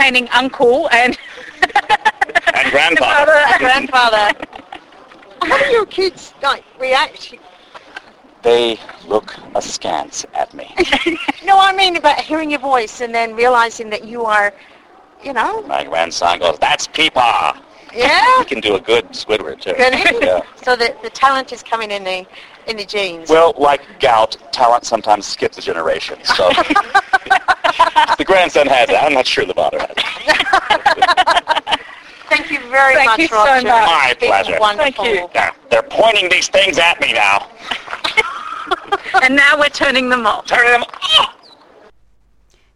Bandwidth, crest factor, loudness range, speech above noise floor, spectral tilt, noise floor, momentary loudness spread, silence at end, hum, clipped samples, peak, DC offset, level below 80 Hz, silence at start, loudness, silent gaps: 14 kHz; 14 dB; 6 LU; 41 dB; -2 dB/octave; -54 dBFS; 11 LU; 1.45 s; none; under 0.1%; 0 dBFS; under 0.1%; -46 dBFS; 0 s; -13 LUFS; none